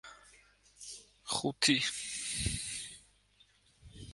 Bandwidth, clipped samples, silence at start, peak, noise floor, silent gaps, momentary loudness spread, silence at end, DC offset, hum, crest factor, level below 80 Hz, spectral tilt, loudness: 12 kHz; under 0.1%; 0.05 s; -14 dBFS; -68 dBFS; none; 23 LU; 0 s; under 0.1%; 50 Hz at -65 dBFS; 26 dB; -54 dBFS; -2 dB/octave; -33 LUFS